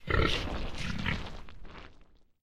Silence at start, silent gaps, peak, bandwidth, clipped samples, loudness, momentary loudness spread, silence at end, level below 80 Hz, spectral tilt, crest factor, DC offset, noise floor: 0 s; none; -12 dBFS; 13.5 kHz; under 0.1%; -33 LUFS; 22 LU; 0.3 s; -40 dBFS; -5 dB/octave; 22 dB; under 0.1%; -57 dBFS